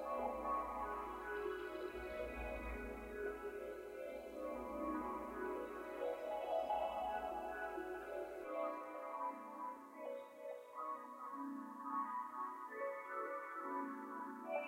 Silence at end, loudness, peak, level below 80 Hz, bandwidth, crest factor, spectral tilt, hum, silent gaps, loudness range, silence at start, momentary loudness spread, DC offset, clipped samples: 0 s; -46 LUFS; -30 dBFS; -62 dBFS; 16 kHz; 16 dB; -5.5 dB/octave; none; none; 4 LU; 0 s; 7 LU; under 0.1%; under 0.1%